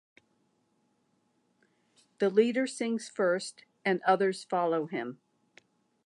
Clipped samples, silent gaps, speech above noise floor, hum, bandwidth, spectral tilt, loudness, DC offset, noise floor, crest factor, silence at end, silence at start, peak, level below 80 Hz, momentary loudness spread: under 0.1%; none; 44 dB; none; 11.5 kHz; -5 dB/octave; -30 LUFS; under 0.1%; -73 dBFS; 20 dB; 0.95 s; 2.2 s; -12 dBFS; -88 dBFS; 10 LU